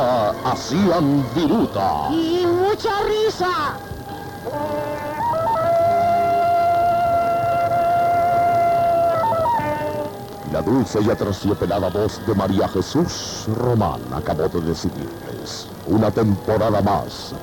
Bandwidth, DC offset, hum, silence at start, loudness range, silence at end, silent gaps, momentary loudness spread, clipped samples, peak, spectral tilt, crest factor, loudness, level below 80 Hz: 19 kHz; under 0.1%; none; 0 s; 4 LU; 0 s; none; 10 LU; under 0.1%; -8 dBFS; -6.5 dB/octave; 12 dB; -20 LUFS; -44 dBFS